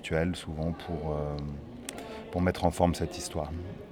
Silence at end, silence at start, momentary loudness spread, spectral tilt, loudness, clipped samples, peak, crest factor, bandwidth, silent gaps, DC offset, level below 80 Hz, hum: 0 s; 0 s; 13 LU; -6 dB/octave; -32 LUFS; under 0.1%; -10 dBFS; 22 dB; 17.5 kHz; none; under 0.1%; -44 dBFS; none